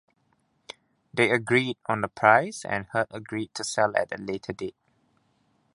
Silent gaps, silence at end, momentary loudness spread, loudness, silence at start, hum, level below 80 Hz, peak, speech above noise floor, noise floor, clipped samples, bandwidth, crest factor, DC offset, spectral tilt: none; 1.05 s; 18 LU; -26 LUFS; 1.15 s; none; -64 dBFS; -2 dBFS; 44 dB; -70 dBFS; under 0.1%; 11.5 kHz; 26 dB; under 0.1%; -4.5 dB/octave